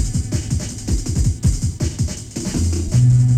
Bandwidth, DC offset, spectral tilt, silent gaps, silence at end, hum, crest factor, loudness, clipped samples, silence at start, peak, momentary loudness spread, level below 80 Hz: 13.5 kHz; under 0.1%; -6 dB/octave; none; 0 s; none; 12 dB; -20 LUFS; under 0.1%; 0 s; -6 dBFS; 9 LU; -26 dBFS